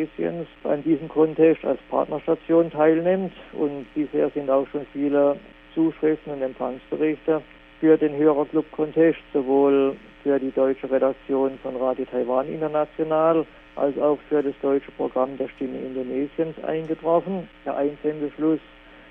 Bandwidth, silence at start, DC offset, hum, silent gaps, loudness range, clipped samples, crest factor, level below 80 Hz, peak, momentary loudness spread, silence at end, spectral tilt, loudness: 3.8 kHz; 0 s; under 0.1%; none; none; 5 LU; under 0.1%; 18 dB; -56 dBFS; -6 dBFS; 10 LU; 0.5 s; -10 dB/octave; -23 LUFS